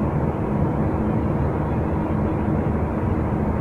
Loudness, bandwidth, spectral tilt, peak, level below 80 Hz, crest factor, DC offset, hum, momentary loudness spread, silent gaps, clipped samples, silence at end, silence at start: -23 LUFS; 4.5 kHz; -10.5 dB/octave; -10 dBFS; -30 dBFS; 12 dB; under 0.1%; none; 1 LU; none; under 0.1%; 0 s; 0 s